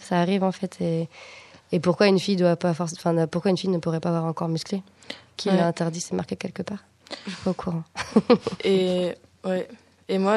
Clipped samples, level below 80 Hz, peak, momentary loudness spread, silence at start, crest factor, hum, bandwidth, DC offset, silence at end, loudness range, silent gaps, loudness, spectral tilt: under 0.1%; -62 dBFS; -4 dBFS; 15 LU; 0 s; 20 dB; none; 12 kHz; under 0.1%; 0 s; 5 LU; none; -25 LUFS; -6 dB/octave